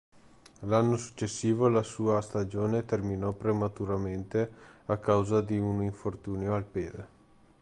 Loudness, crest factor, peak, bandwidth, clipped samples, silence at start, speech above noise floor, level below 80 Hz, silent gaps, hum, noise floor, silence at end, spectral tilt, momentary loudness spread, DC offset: -30 LUFS; 18 dB; -12 dBFS; 11 kHz; under 0.1%; 0.6 s; 26 dB; -54 dBFS; none; none; -55 dBFS; 0.55 s; -7 dB/octave; 10 LU; under 0.1%